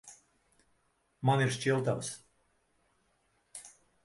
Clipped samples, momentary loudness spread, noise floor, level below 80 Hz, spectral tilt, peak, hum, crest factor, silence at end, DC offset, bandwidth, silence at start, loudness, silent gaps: under 0.1%; 20 LU; -74 dBFS; -72 dBFS; -5 dB/octave; -14 dBFS; none; 22 dB; 0.35 s; under 0.1%; 11.5 kHz; 0.05 s; -31 LUFS; none